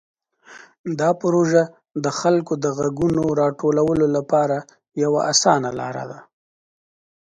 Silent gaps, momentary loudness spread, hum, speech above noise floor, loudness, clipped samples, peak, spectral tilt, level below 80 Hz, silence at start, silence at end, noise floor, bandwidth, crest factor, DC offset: 0.79-0.84 s; 12 LU; none; 27 dB; -20 LUFS; under 0.1%; -2 dBFS; -4.5 dB/octave; -54 dBFS; 0.5 s; 1.1 s; -46 dBFS; 10 kHz; 18 dB; under 0.1%